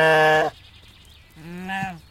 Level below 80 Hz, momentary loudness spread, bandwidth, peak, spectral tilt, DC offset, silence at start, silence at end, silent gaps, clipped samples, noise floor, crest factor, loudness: -54 dBFS; 20 LU; 16 kHz; -6 dBFS; -4.5 dB/octave; under 0.1%; 0 s; 0.1 s; none; under 0.1%; -49 dBFS; 16 dB; -20 LUFS